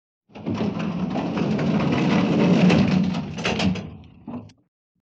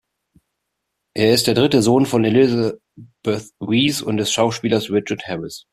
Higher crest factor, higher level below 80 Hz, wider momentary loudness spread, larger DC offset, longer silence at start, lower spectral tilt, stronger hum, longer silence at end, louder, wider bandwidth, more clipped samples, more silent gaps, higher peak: about the same, 16 dB vs 16 dB; first, -48 dBFS vs -54 dBFS; first, 20 LU vs 12 LU; neither; second, 0.35 s vs 1.15 s; first, -7 dB/octave vs -5 dB/octave; neither; first, 0.6 s vs 0.15 s; second, -22 LUFS vs -18 LUFS; second, 7.8 kHz vs 15 kHz; neither; neither; second, -6 dBFS vs -2 dBFS